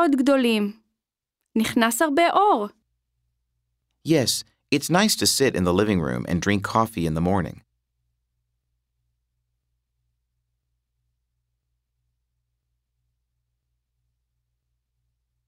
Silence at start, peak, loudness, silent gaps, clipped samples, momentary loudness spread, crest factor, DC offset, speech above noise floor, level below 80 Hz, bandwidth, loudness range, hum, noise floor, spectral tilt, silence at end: 0 s; -4 dBFS; -21 LUFS; none; under 0.1%; 8 LU; 22 dB; under 0.1%; 64 dB; -52 dBFS; 16 kHz; 7 LU; none; -84 dBFS; -4.5 dB/octave; 7.95 s